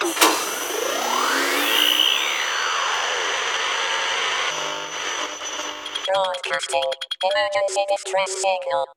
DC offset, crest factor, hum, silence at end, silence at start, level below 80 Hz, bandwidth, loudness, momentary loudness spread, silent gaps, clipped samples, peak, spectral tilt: under 0.1%; 22 dB; none; 0.05 s; 0 s; -68 dBFS; 17.5 kHz; -21 LUFS; 9 LU; none; under 0.1%; 0 dBFS; 0.5 dB/octave